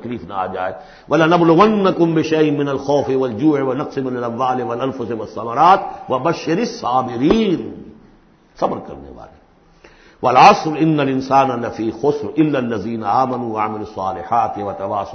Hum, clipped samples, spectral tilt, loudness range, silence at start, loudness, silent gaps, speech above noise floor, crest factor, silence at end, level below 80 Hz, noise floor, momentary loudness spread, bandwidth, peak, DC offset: none; under 0.1%; -6.5 dB/octave; 5 LU; 0 s; -17 LUFS; none; 33 dB; 18 dB; 0 s; -50 dBFS; -50 dBFS; 12 LU; 6.6 kHz; 0 dBFS; under 0.1%